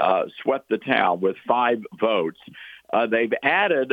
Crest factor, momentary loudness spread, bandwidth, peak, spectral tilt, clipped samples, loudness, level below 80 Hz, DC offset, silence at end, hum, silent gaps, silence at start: 18 dB; 9 LU; 5 kHz; -4 dBFS; -7 dB/octave; under 0.1%; -22 LUFS; -72 dBFS; under 0.1%; 0 s; none; none; 0 s